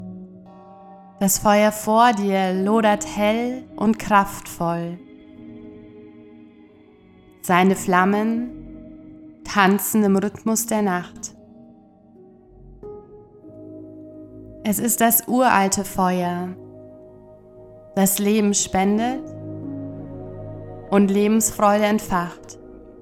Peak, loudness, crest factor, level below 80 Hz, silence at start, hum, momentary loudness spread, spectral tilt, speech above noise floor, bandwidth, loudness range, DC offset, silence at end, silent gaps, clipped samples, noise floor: 0 dBFS; -19 LUFS; 22 dB; -50 dBFS; 0 s; none; 23 LU; -4.5 dB/octave; 31 dB; 17.5 kHz; 7 LU; under 0.1%; 0.1 s; none; under 0.1%; -50 dBFS